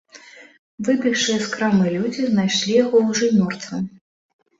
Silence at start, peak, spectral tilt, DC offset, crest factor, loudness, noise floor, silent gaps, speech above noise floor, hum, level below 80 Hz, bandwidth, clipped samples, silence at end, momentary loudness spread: 0.15 s; -4 dBFS; -4.5 dB/octave; under 0.1%; 16 dB; -19 LUFS; -45 dBFS; 0.59-0.78 s; 26 dB; none; -62 dBFS; 8 kHz; under 0.1%; 0.7 s; 10 LU